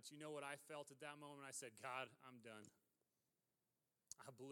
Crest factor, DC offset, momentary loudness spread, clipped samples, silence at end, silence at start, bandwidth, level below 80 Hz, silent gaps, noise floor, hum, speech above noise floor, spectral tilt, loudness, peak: 24 dB; under 0.1%; 11 LU; under 0.1%; 0 s; 0 s; 19 kHz; under -90 dBFS; none; under -90 dBFS; none; over 34 dB; -3 dB/octave; -55 LUFS; -34 dBFS